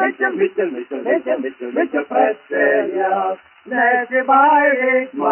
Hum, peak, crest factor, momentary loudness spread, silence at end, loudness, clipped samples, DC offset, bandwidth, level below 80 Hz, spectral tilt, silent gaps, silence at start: none; 0 dBFS; 16 dB; 11 LU; 0 s; -17 LUFS; under 0.1%; under 0.1%; 3.2 kHz; -74 dBFS; -8 dB/octave; none; 0 s